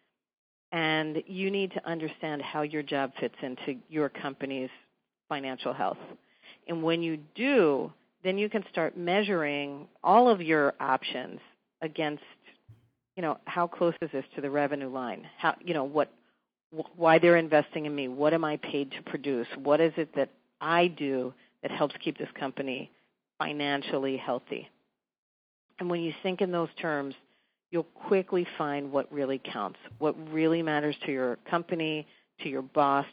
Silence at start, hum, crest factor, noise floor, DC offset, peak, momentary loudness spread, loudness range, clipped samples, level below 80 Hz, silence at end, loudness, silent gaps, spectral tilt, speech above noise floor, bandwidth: 0.7 s; none; 24 dB; -59 dBFS; under 0.1%; -6 dBFS; 13 LU; 7 LU; under 0.1%; -80 dBFS; 0 s; -30 LUFS; 16.64-16.70 s, 25.18-25.69 s; -3.5 dB/octave; 30 dB; 4.9 kHz